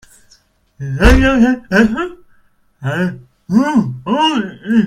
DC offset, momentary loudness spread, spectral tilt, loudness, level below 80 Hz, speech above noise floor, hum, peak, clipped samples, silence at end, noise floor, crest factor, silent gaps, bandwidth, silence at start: under 0.1%; 15 LU; -6 dB/octave; -14 LUFS; -24 dBFS; 39 dB; none; 0 dBFS; under 0.1%; 0 s; -52 dBFS; 14 dB; none; 15 kHz; 0.8 s